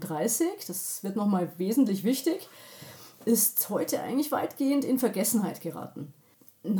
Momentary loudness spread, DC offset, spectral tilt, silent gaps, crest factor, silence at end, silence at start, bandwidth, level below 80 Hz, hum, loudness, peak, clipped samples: 19 LU; under 0.1%; -4.5 dB/octave; none; 16 dB; 0 s; 0 s; over 20 kHz; -84 dBFS; none; -28 LUFS; -12 dBFS; under 0.1%